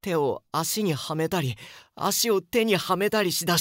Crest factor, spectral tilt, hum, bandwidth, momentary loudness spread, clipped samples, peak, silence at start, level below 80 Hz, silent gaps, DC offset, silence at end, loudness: 16 dB; -3.5 dB/octave; none; 16.5 kHz; 7 LU; under 0.1%; -10 dBFS; 0.05 s; -62 dBFS; none; under 0.1%; 0 s; -25 LUFS